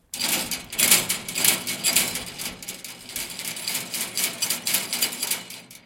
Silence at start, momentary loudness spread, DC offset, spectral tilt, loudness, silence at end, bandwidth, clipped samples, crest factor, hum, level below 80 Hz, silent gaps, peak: 0.15 s; 14 LU; under 0.1%; 0 dB/octave; -23 LUFS; 0.05 s; 17 kHz; under 0.1%; 24 dB; none; -58 dBFS; none; -2 dBFS